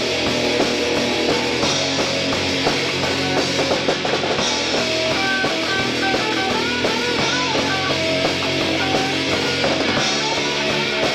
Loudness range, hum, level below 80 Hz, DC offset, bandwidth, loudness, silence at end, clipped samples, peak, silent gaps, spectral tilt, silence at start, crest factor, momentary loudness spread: 0 LU; none; -48 dBFS; under 0.1%; 16 kHz; -18 LUFS; 0 s; under 0.1%; -6 dBFS; none; -3 dB/octave; 0 s; 14 dB; 1 LU